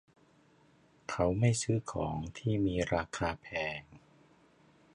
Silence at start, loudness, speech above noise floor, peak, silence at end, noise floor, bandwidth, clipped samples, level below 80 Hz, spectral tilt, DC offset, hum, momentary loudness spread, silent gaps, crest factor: 1.1 s; -34 LUFS; 33 dB; -16 dBFS; 0.95 s; -65 dBFS; 11 kHz; under 0.1%; -52 dBFS; -5.5 dB/octave; under 0.1%; none; 9 LU; none; 20 dB